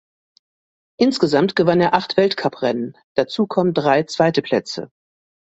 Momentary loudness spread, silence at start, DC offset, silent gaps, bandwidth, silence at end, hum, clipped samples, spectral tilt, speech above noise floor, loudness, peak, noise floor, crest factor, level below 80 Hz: 8 LU; 1 s; under 0.1%; 3.04-3.15 s; 8.2 kHz; 0.65 s; none; under 0.1%; -6 dB/octave; over 72 dB; -18 LUFS; -2 dBFS; under -90 dBFS; 18 dB; -60 dBFS